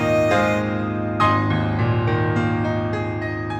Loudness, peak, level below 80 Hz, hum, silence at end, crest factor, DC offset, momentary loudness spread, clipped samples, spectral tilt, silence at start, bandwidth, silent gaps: -21 LUFS; -6 dBFS; -42 dBFS; none; 0 s; 14 dB; under 0.1%; 7 LU; under 0.1%; -7.5 dB/octave; 0 s; 8.4 kHz; none